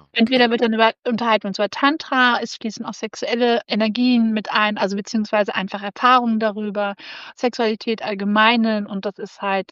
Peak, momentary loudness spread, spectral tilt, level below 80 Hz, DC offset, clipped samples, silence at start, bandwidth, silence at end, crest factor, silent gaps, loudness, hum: -2 dBFS; 12 LU; -5 dB/octave; -68 dBFS; under 0.1%; under 0.1%; 0.15 s; 7.6 kHz; 0.1 s; 18 dB; 0.99-1.03 s; -19 LUFS; none